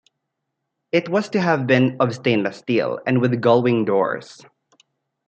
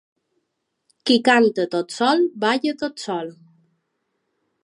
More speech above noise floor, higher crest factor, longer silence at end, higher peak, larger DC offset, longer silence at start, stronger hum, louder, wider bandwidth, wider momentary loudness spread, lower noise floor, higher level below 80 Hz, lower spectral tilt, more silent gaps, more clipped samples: about the same, 59 dB vs 57 dB; about the same, 18 dB vs 20 dB; second, 0.95 s vs 1.35 s; about the same, -4 dBFS vs -2 dBFS; neither; about the same, 0.95 s vs 1.05 s; neither; about the same, -19 LUFS vs -20 LUFS; second, 8.6 kHz vs 11.5 kHz; second, 6 LU vs 13 LU; about the same, -78 dBFS vs -76 dBFS; first, -66 dBFS vs -76 dBFS; first, -7 dB/octave vs -4 dB/octave; neither; neither